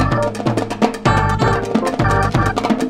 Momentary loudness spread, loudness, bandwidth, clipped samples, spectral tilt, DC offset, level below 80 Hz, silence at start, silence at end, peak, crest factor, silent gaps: 4 LU; -17 LUFS; 14.5 kHz; under 0.1%; -6.5 dB/octave; under 0.1%; -30 dBFS; 0 s; 0 s; 0 dBFS; 16 dB; none